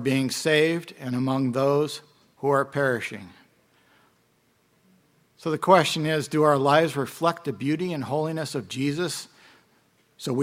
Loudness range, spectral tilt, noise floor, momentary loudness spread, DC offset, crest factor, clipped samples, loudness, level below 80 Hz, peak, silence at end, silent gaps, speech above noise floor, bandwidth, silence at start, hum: 7 LU; -5 dB/octave; -65 dBFS; 12 LU; under 0.1%; 24 dB; under 0.1%; -24 LUFS; -70 dBFS; -2 dBFS; 0 s; none; 42 dB; 16.5 kHz; 0 s; none